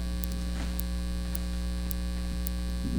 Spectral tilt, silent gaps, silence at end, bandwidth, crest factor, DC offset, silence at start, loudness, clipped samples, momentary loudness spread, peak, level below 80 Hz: -5.5 dB/octave; none; 0 s; over 20 kHz; 26 dB; under 0.1%; 0 s; -34 LUFS; under 0.1%; 1 LU; -4 dBFS; -32 dBFS